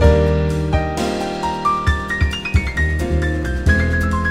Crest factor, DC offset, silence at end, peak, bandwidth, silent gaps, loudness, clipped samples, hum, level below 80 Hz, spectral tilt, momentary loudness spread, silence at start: 16 dB; under 0.1%; 0 s; 0 dBFS; 12 kHz; none; -18 LUFS; under 0.1%; none; -22 dBFS; -6.5 dB/octave; 5 LU; 0 s